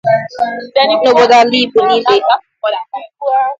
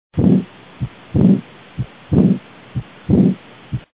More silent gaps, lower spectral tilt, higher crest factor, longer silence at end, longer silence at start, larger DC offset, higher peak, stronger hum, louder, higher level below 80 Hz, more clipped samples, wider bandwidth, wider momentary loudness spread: neither; second, -4 dB/octave vs -13 dB/octave; about the same, 12 dB vs 16 dB; about the same, 0.05 s vs 0.15 s; about the same, 0.05 s vs 0.15 s; second, under 0.1% vs 0.1%; about the same, 0 dBFS vs 0 dBFS; neither; first, -11 LUFS vs -16 LUFS; second, -58 dBFS vs -36 dBFS; neither; first, 7.8 kHz vs 4 kHz; second, 11 LU vs 15 LU